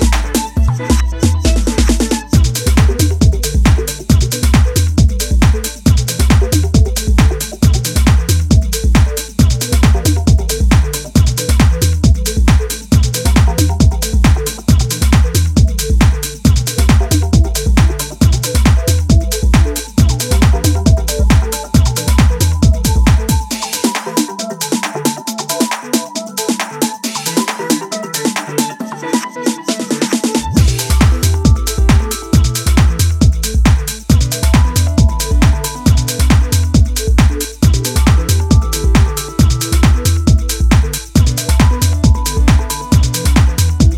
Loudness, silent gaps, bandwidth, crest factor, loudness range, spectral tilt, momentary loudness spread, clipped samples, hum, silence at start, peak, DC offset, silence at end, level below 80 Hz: -13 LUFS; none; 16.5 kHz; 12 dB; 4 LU; -5 dB/octave; 5 LU; under 0.1%; none; 0 s; 0 dBFS; under 0.1%; 0 s; -14 dBFS